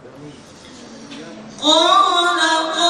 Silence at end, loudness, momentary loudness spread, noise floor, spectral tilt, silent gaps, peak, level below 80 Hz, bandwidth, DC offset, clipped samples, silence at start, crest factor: 0 s; -14 LUFS; 23 LU; -40 dBFS; -1 dB/octave; none; 0 dBFS; -62 dBFS; 13 kHz; under 0.1%; under 0.1%; 0.05 s; 18 dB